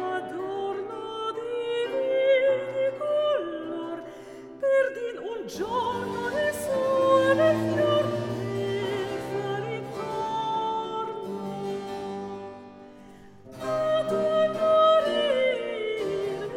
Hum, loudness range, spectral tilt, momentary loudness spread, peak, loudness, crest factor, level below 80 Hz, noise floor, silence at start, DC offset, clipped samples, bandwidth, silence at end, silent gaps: none; 7 LU; -5.5 dB/octave; 13 LU; -10 dBFS; -26 LUFS; 16 dB; -64 dBFS; -49 dBFS; 0 s; under 0.1%; under 0.1%; 16 kHz; 0 s; none